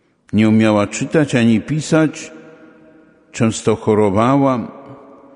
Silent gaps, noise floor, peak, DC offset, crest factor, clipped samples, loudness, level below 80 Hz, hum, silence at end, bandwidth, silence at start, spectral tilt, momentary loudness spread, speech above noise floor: none; -47 dBFS; -2 dBFS; under 0.1%; 16 dB; under 0.1%; -15 LUFS; -52 dBFS; none; 0.4 s; 11 kHz; 0.35 s; -6 dB/octave; 10 LU; 33 dB